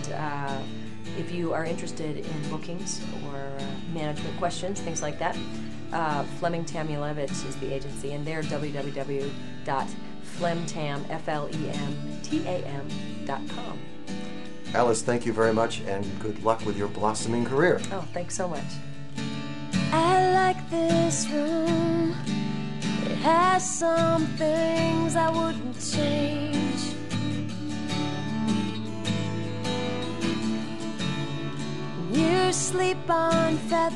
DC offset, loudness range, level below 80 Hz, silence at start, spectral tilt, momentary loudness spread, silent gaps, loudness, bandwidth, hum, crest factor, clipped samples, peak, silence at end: 2%; 8 LU; -56 dBFS; 0 s; -5 dB/octave; 12 LU; none; -28 LUFS; 12 kHz; none; 20 dB; under 0.1%; -6 dBFS; 0 s